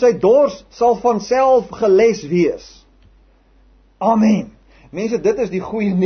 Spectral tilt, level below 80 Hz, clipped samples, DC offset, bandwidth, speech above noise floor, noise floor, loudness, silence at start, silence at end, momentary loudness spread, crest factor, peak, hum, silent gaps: -7 dB/octave; -50 dBFS; under 0.1%; under 0.1%; 6.6 kHz; 36 dB; -51 dBFS; -16 LUFS; 0 s; 0 s; 9 LU; 14 dB; -2 dBFS; none; none